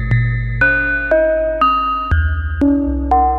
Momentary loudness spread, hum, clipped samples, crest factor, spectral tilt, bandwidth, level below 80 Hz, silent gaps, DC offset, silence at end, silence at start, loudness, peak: 4 LU; none; under 0.1%; 12 dB; -9 dB/octave; 5.2 kHz; -24 dBFS; none; under 0.1%; 0 s; 0 s; -15 LUFS; -4 dBFS